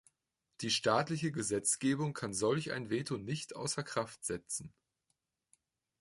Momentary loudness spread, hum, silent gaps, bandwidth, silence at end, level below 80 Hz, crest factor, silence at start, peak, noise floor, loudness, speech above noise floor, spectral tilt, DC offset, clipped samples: 9 LU; none; none; 12 kHz; 1.3 s; -70 dBFS; 22 dB; 0.6 s; -16 dBFS; -85 dBFS; -35 LUFS; 50 dB; -4 dB/octave; under 0.1%; under 0.1%